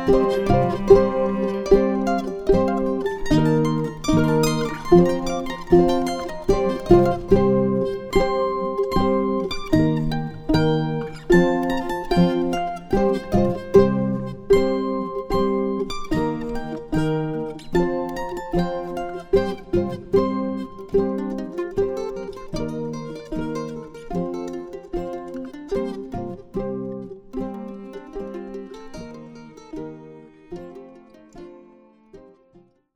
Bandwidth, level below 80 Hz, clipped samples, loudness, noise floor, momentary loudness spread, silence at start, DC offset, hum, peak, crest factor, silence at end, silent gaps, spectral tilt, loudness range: 15 kHz; -36 dBFS; under 0.1%; -22 LUFS; -55 dBFS; 17 LU; 0 s; under 0.1%; none; 0 dBFS; 20 dB; 0.75 s; none; -7 dB/octave; 15 LU